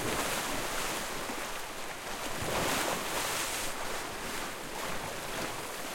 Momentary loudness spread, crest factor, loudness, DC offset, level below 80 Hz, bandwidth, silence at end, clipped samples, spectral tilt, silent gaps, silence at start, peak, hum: 7 LU; 16 dB; -34 LUFS; under 0.1%; -50 dBFS; 16.5 kHz; 0 s; under 0.1%; -2 dB/octave; none; 0 s; -18 dBFS; none